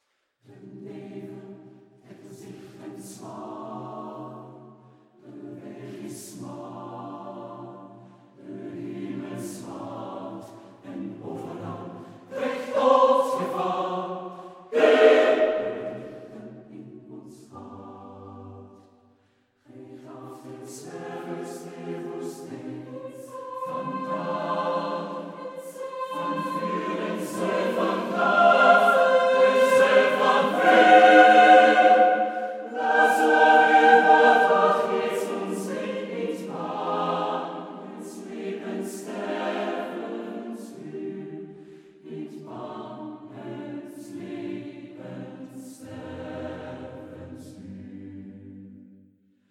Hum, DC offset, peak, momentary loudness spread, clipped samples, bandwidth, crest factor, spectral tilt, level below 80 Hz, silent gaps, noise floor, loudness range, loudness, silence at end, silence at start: none; under 0.1%; -2 dBFS; 26 LU; under 0.1%; 15.5 kHz; 22 dB; -4.5 dB/octave; -74 dBFS; none; -66 dBFS; 24 LU; -21 LUFS; 0.75 s; 0.6 s